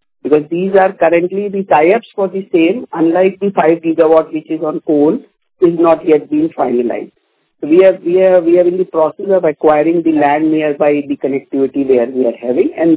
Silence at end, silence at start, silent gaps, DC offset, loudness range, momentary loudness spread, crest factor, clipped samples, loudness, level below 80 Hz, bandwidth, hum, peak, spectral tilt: 0 s; 0.25 s; none; under 0.1%; 2 LU; 8 LU; 12 dB; under 0.1%; -12 LUFS; -56 dBFS; 4 kHz; none; 0 dBFS; -11 dB/octave